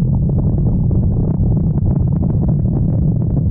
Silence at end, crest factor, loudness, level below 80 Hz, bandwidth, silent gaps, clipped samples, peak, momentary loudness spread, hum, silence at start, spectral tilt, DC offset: 0 s; 8 dB; -16 LUFS; -22 dBFS; 1.6 kHz; none; under 0.1%; -6 dBFS; 0 LU; none; 0 s; -17 dB/octave; under 0.1%